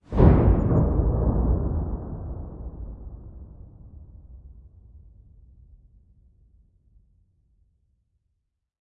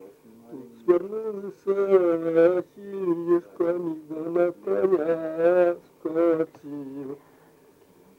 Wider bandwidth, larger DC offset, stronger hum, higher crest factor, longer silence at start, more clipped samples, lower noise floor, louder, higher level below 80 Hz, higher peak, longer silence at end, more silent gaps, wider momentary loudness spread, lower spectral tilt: second, 3.7 kHz vs 4.6 kHz; neither; neither; first, 24 dB vs 18 dB; about the same, 0.1 s vs 0 s; neither; first, -77 dBFS vs -56 dBFS; about the same, -23 LUFS vs -24 LUFS; first, -30 dBFS vs -76 dBFS; first, -2 dBFS vs -6 dBFS; first, 3.85 s vs 1 s; neither; first, 28 LU vs 17 LU; first, -12 dB/octave vs -8.5 dB/octave